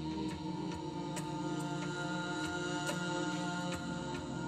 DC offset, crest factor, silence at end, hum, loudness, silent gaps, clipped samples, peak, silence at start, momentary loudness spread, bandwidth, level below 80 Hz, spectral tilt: under 0.1%; 16 dB; 0 s; none; -38 LUFS; none; under 0.1%; -24 dBFS; 0 s; 4 LU; 15.5 kHz; -60 dBFS; -5 dB/octave